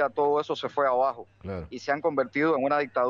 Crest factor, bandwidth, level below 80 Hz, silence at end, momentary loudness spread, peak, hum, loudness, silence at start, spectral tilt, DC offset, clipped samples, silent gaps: 14 dB; 7.4 kHz; -60 dBFS; 0 s; 13 LU; -12 dBFS; none; -26 LUFS; 0 s; -6 dB/octave; under 0.1%; under 0.1%; none